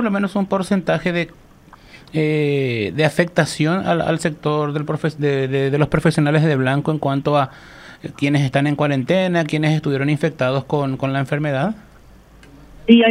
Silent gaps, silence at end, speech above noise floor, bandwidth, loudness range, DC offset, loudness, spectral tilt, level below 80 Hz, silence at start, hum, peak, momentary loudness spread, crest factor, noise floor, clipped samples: none; 0 s; 27 dB; 12 kHz; 2 LU; under 0.1%; -19 LUFS; -6.5 dB/octave; -48 dBFS; 0 s; none; 0 dBFS; 6 LU; 18 dB; -45 dBFS; under 0.1%